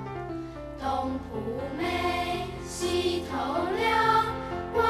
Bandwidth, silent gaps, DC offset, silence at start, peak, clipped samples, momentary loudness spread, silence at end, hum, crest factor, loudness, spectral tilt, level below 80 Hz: 14 kHz; none; under 0.1%; 0 s; -12 dBFS; under 0.1%; 12 LU; 0 s; none; 18 dB; -29 LUFS; -4.5 dB/octave; -48 dBFS